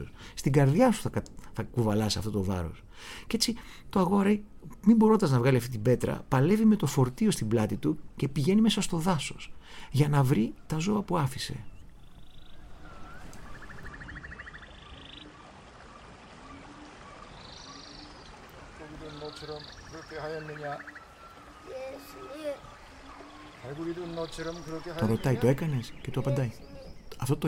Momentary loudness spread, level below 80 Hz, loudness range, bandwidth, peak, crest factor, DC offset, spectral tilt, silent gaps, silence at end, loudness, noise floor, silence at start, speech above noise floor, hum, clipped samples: 24 LU; -50 dBFS; 21 LU; 16.5 kHz; -10 dBFS; 20 dB; under 0.1%; -6 dB/octave; none; 0 s; -28 LUFS; -50 dBFS; 0 s; 23 dB; none; under 0.1%